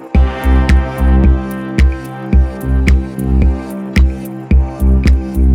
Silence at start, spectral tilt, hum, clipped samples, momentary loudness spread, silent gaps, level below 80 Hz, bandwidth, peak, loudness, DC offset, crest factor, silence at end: 0 s; -8 dB/octave; none; under 0.1%; 6 LU; none; -12 dBFS; 10 kHz; -2 dBFS; -14 LUFS; under 0.1%; 10 dB; 0 s